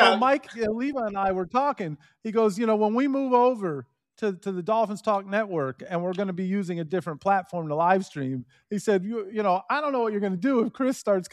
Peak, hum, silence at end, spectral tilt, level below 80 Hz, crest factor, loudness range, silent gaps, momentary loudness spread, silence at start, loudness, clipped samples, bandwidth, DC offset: -4 dBFS; none; 0.05 s; -6 dB/octave; -64 dBFS; 22 dB; 3 LU; none; 9 LU; 0 s; -26 LUFS; under 0.1%; 13.5 kHz; under 0.1%